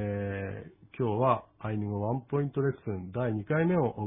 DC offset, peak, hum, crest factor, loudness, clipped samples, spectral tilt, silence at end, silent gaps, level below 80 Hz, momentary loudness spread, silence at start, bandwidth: under 0.1%; -10 dBFS; none; 20 dB; -31 LUFS; under 0.1%; -12 dB/octave; 0 s; none; -60 dBFS; 10 LU; 0 s; 3.8 kHz